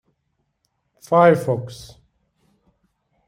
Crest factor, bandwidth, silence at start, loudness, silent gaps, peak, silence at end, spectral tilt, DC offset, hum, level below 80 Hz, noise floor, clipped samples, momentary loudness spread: 20 dB; 14.5 kHz; 1.1 s; -17 LUFS; none; -2 dBFS; 1.45 s; -7 dB/octave; under 0.1%; none; -60 dBFS; -72 dBFS; under 0.1%; 22 LU